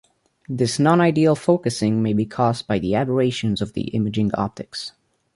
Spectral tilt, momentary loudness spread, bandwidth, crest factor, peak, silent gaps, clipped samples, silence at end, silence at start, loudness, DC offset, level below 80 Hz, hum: -6.5 dB/octave; 12 LU; 11.5 kHz; 18 dB; -4 dBFS; none; under 0.1%; 0.45 s; 0.5 s; -20 LUFS; under 0.1%; -50 dBFS; none